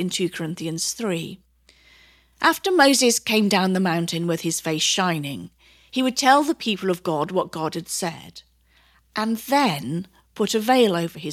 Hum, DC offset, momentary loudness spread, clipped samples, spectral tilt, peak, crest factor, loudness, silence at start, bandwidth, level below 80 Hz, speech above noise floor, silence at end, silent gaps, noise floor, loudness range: none; under 0.1%; 12 LU; under 0.1%; -3.5 dB/octave; -2 dBFS; 20 dB; -21 LUFS; 0 s; 16.5 kHz; -62 dBFS; 37 dB; 0 s; none; -58 dBFS; 6 LU